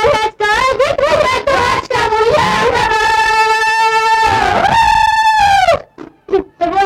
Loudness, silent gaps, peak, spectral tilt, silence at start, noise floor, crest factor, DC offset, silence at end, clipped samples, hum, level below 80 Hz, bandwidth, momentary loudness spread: -11 LUFS; none; -2 dBFS; -3 dB/octave; 0 s; -34 dBFS; 10 dB; under 0.1%; 0 s; under 0.1%; none; -36 dBFS; 16 kHz; 4 LU